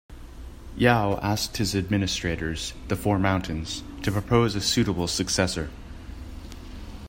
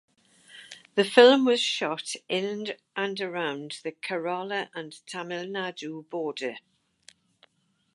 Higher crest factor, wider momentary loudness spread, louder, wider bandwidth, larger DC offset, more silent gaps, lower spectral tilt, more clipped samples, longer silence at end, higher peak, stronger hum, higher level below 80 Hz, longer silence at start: about the same, 22 dB vs 26 dB; about the same, 20 LU vs 20 LU; about the same, -25 LUFS vs -26 LUFS; first, 16.5 kHz vs 11.5 kHz; neither; neither; about the same, -4.5 dB/octave vs -3.5 dB/octave; neither; second, 0 s vs 1.35 s; second, -4 dBFS vs 0 dBFS; neither; first, -40 dBFS vs -84 dBFS; second, 0.1 s vs 0.55 s